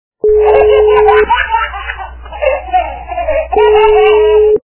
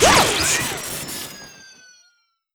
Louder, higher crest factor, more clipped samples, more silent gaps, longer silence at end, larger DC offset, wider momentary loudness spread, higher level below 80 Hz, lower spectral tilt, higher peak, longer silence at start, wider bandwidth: first, -9 LUFS vs -19 LUFS; second, 10 dB vs 20 dB; first, 0.4% vs under 0.1%; neither; second, 0.1 s vs 1 s; neither; second, 13 LU vs 22 LU; first, -28 dBFS vs -42 dBFS; first, -8.5 dB/octave vs -1.5 dB/octave; about the same, 0 dBFS vs -2 dBFS; first, 0.25 s vs 0 s; second, 4 kHz vs over 20 kHz